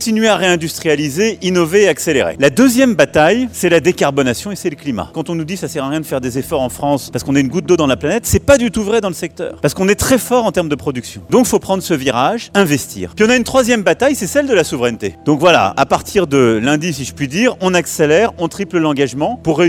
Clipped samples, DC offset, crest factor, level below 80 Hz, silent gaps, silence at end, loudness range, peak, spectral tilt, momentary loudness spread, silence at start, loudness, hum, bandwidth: under 0.1%; under 0.1%; 14 dB; -40 dBFS; none; 0 s; 4 LU; 0 dBFS; -4.5 dB/octave; 9 LU; 0 s; -14 LUFS; none; 17 kHz